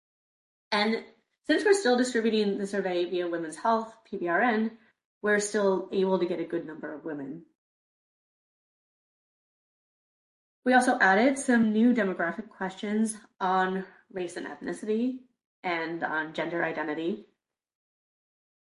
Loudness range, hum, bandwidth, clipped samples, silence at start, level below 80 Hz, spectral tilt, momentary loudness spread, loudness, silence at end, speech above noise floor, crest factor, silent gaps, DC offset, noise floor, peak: 8 LU; none; 11.5 kHz; under 0.1%; 0.7 s; -74 dBFS; -4.5 dB/octave; 14 LU; -28 LUFS; 1.5 s; over 63 dB; 20 dB; 5.05-5.21 s, 7.55-10.62 s, 15.46-15.63 s; under 0.1%; under -90 dBFS; -10 dBFS